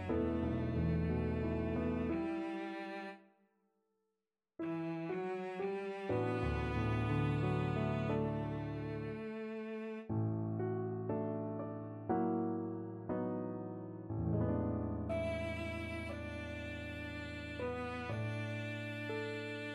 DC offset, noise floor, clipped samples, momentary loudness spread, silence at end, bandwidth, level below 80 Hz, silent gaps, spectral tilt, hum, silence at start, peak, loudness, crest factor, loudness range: under 0.1%; under -90 dBFS; under 0.1%; 8 LU; 0 s; 11 kHz; -52 dBFS; none; -8.5 dB/octave; none; 0 s; -24 dBFS; -39 LUFS; 16 dB; 5 LU